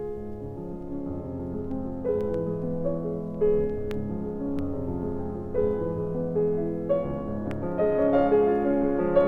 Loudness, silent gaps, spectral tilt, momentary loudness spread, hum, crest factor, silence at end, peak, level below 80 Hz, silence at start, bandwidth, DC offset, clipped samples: -28 LUFS; none; -10.5 dB/octave; 12 LU; none; 18 dB; 0 s; -10 dBFS; -44 dBFS; 0 s; 4.6 kHz; under 0.1%; under 0.1%